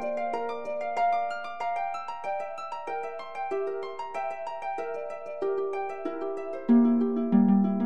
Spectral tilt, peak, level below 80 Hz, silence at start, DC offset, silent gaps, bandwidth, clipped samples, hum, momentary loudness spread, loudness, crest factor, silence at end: -8.5 dB/octave; -10 dBFS; -74 dBFS; 0 s; 0.6%; none; 8 kHz; under 0.1%; none; 13 LU; -29 LUFS; 18 dB; 0 s